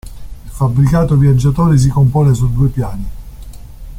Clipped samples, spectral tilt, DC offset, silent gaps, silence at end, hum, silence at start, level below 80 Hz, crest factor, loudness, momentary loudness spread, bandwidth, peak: under 0.1%; -8.5 dB/octave; under 0.1%; none; 0 s; none; 0.05 s; -26 dBFS; 12 dB; -12 LUFS; 13 LU; 14.5 kHz; -2 dBFS